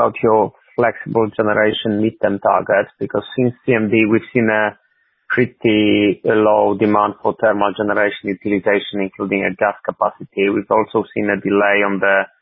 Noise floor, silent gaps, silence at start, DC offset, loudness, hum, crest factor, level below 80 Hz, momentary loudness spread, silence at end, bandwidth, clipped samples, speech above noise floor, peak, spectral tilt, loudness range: -57 dBFS; none; 0 s; under 0.1%; -17 LUFS; none; 16 dB; -54 dBFS; 6 LU; 0.15 s; 4 kHz; under 0.1%; 41 dB; 0 dBFS; -10.5 dB/octave; 3 LU